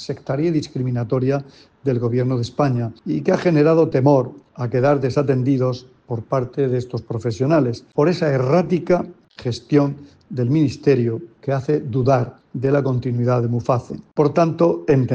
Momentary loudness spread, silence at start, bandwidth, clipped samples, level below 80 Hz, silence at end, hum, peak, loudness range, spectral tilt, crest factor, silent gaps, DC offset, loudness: 11 LU; 0 s; 8 kHz; under 0.1%; -54 dBFS; 0 s; none; -4 dBFS; 3 LU; -8.5 dB/octave; 16 dB; none; under 0.1%; -20 LUFS